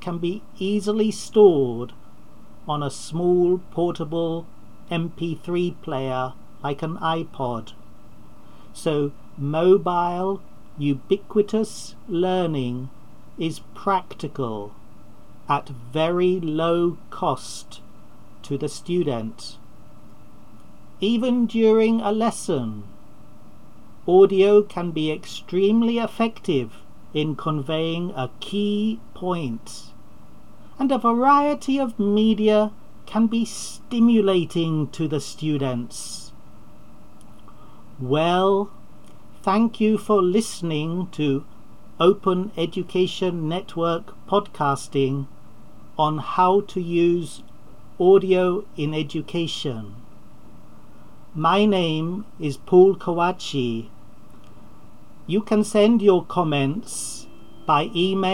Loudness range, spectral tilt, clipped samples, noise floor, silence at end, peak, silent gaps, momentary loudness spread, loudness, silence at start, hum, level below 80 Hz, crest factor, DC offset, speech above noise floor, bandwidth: 7 LU; -6 dB/octave; under 0.1%; -49 dBFS; 0 s; -4 dBFS; none; 14 LU; -22 LUFS; 0 s; none; -56 dBFS; 18 dB; 2%; 28 dB; 14 kHz